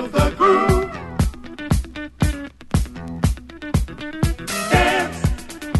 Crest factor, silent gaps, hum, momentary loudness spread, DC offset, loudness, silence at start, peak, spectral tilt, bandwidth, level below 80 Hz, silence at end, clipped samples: 18 dB; none; none; 14 LU; under 0.1%; -21 LUFS; 0 s; -2 dBFS; -5.5 dB/octave; 12.5 kHz; -28 dBFS; 0 s; under 0.1%